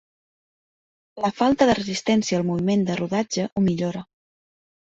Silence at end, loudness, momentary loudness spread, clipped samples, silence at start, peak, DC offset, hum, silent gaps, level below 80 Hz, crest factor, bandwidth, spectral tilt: 0.9 s; -22 LUFS; 8 LU; under 0.1%; 1.15 s; -4 dBFS; under 0.1%; none; 3.52-3.56 s; -54 dBFS; 20 dB; 8 kHz; -5.5 dB/octave